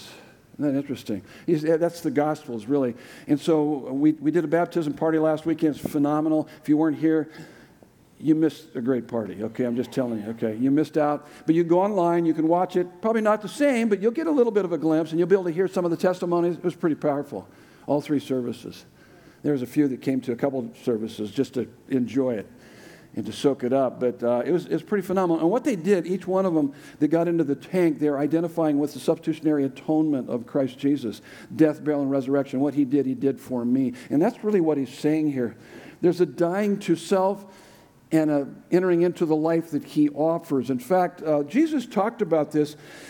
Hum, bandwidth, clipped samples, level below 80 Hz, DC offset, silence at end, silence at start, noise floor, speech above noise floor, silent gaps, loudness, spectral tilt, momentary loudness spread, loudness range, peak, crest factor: none; 18 kHz; under 0.1%; -70 dBFS; under 0.1%; 0 s; 0 s; -54 dBFS; 30 dB; none; -24 LUFS; -7.5 dB/octave; 7 LU; 4 LU; -6 dBFS; 18 dB